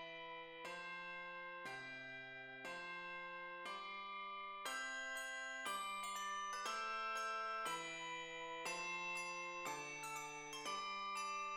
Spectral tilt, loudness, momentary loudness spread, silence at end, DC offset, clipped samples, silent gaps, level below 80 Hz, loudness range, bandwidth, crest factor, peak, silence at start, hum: -1 dB/octave; -46 LUFS; 7 LU; 0 s; under 0.1%; under 0.1%; none; -82 dBFS; 5 LU; 18 kHz; 16 dB; -32 dBFS; 0 s; none